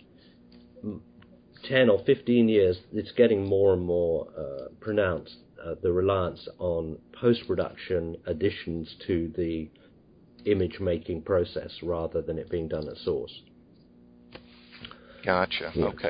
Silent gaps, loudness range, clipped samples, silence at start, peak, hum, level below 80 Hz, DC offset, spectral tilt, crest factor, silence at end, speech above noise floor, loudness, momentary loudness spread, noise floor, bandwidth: none; 9 LU; under 0.1%; 0.75 s; -6 dBFS; none; -48 dBFS; under 0.1%; -10.5 dB/octave; 22 dB; 0 s; 30 dB; -27 LUFS; 17 LU; -56 dBFS; 5.2 kHz